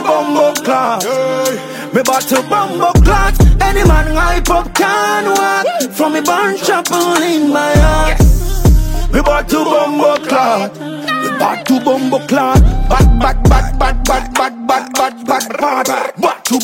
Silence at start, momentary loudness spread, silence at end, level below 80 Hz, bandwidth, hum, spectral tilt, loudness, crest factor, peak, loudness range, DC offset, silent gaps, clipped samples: 0 s; 5 LU; 0 s; -16 dBFS; 16.5 kHz; none; -5 dB/octave; -12 LUFS; 12 dB; 0 dBFS; 2 LU; under 0.1%; none; under 0.1%